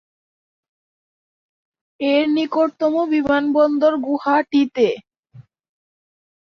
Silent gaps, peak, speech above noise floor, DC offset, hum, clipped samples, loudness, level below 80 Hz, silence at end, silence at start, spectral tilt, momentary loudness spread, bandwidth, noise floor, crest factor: 5.19-5.23 s; -4 dBFS; 30 dB; under 0.1%; none; under 0.1%; -18 LUFS; -60 dBFS; 1.15 s; 2 s; -6 dB/octave; 4 LU; 6.4 kHz; -47 dBFS; 16 dB